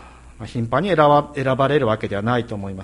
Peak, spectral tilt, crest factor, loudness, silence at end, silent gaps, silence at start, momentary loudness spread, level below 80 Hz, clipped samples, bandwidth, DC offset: -2 dBFS; -7.5 dB/octave; 18 dB; -19 LUFS; 0 s; none; 0 s; 14 LU; -46 dBFS; under 0.1%; 11.5 kHz; under 0.1%